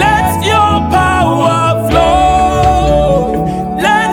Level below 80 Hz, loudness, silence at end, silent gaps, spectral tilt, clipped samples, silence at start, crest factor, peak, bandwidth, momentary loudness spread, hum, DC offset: -22 dBFS; -10 LUFS; 0 s; none; -5.5 dB/octave; under 0.1%; 0 s; 10 dB; 0 dBFS; 18.5 kHz; 4 LU; none; under 0.1%